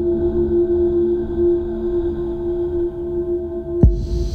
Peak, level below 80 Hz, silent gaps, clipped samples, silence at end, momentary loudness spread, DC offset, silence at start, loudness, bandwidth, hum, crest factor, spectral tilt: -2 dBFS; -26 dBFS; none; under 0.1%; 0 s; 6 LU; under 0.1%; 0 s; -20 LUFS; 6.4 kHz; none; 18 dB; -10.5 dB/octave